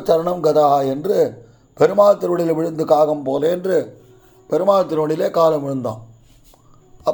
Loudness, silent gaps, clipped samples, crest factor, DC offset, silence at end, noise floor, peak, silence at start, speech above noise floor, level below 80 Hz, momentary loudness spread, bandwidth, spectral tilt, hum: -17 LUFS; none; under 0.1%; 16 dB; under 0.1%; 0 s; -49 dBFS; -2 dBFS; 0 s; 33 dB; -58 dBFS; 10 LU; over 20 kHz; -7 dB/octave; none